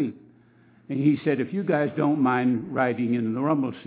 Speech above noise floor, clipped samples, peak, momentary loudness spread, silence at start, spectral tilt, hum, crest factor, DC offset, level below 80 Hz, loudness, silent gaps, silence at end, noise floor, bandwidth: 33 dB; under 0.1%; -8 dBFS; 4 LU; 0 s; -11.5 dB/octave; none; 16 dB; under 0.1%; -70 dBFS; -24 LUFS; none; 0.05 s; -56 dBFS; 4 kHz